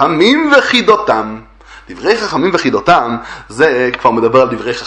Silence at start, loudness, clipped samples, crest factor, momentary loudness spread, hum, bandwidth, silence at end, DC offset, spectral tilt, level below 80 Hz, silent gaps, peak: 0 s; -11 LUFS; 0.2%; 12 dB; 11 LU; none; 10.5 kHz; 0 s; under 0.1%; -4.5 dB/octave; -44 dBFS; none; 0 dBFS